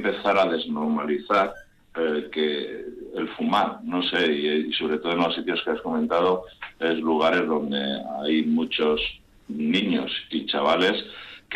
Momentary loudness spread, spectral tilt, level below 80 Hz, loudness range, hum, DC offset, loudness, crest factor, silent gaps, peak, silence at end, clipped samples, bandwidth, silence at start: 9 LU; -5.5 dB/octave; -56 dBFS; 2 LU; none; under 0.1%; -24 LUFS; 14 dB; none; -10 dBFS; 0 s; under 0.1%; 9.4 kHz; 0 s